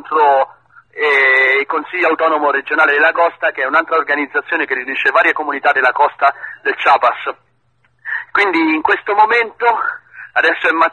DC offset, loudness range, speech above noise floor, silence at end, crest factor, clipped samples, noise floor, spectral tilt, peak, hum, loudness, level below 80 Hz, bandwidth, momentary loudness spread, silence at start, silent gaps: under 0.1%; 3 LU; 46 dB; 0 s; 14 dB; under 0.1%; -60 dBFS; -3.5 dB/octave; 0 dBFS; none; -14 LUFS; -62 dBFS; 9.6 kHz; 9 LU; 0.05 s; none